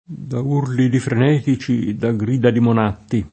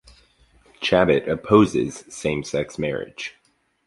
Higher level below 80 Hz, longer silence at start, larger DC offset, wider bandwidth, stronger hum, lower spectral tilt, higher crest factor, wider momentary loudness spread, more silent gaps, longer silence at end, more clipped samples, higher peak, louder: about the same, -50 dBFS vs -50 dBFS; second, 0.1 s vs 0.8 s; neither; second, 8.8 kHz vs 11.5 kHz; neither; first, -8 dB/octave vs -5.5 dB/octave; about the same, 16 dB vs 20 dB; second, 5 LU vs 14 LU; neither; second, 0.05 s vs 0.55 s; neither; about the same, -2 dBFS vs -2 dBFS; first, -18 LUFS vs -21 LUFS